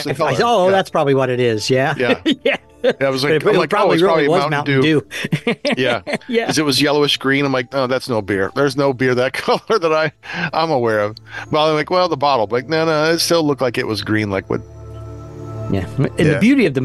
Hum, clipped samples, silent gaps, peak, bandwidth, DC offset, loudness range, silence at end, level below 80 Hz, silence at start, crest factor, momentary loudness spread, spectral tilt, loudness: none; under 0.1%; none; -4 dBFS; 12.5 kHz; 0.2%; 3 LU; 0 s; -48 dBFS; 0 s; 12 dB; 8 LU; -5 dB/octave; -16 LUFS